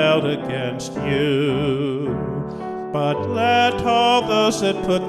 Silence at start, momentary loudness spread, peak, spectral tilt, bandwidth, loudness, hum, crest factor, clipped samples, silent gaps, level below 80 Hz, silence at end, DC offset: 0 s; 10 LU; -6 dBFS; -5 dB/octave; 13 kHz; -20 LUFS; none; 14 dB; under 0.1%; none; -48 dBFS; 0 s; under 0.1%